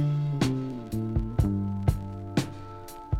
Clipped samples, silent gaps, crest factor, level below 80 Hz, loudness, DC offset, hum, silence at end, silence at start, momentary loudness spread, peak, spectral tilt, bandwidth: under 0.1%; none; 18 dB; -38 dBFS; -29 LUFS; under 0.1%; none; 0 s; 0 s; 12 LU; -10 dBFS; -7 dB/octave; 16 kHz